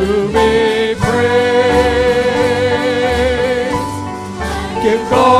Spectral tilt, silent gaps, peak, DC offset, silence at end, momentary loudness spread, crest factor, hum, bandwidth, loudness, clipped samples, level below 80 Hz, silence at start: -5 dB/octave; none; 0 dBFS; under 0.1%; 0 s; 9 LU; 14 dB; none; 14.5 kHz; -14 LUFS; under 0.1%; -30 dBFS; 0 s